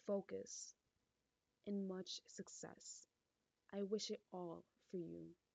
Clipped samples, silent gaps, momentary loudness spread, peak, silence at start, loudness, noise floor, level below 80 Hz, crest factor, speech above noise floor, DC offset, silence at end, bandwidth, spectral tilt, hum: under 0.1%; none; 12 LU; -32 dBFS; 0.05 s; -50 LUFS; -90 dBFS; under -90 dBFS; 20 dB; 40 dB; under 0.1%; 0.2 s; 9 kHz; -4.5 dB/octave; none